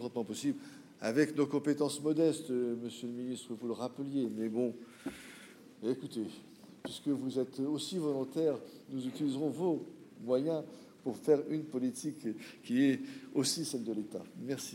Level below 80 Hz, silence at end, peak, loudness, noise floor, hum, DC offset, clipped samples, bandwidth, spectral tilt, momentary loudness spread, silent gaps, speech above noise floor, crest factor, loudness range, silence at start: -82 dBFS; 0 s; -16 dBFS; -36 LUFS; -55 dBFS; none; under 0.1%; under 0.1%; 16 kHz; -5 dB/octave; 14 LU; none; 20 dB; 20 dB; 5 LU; 0 s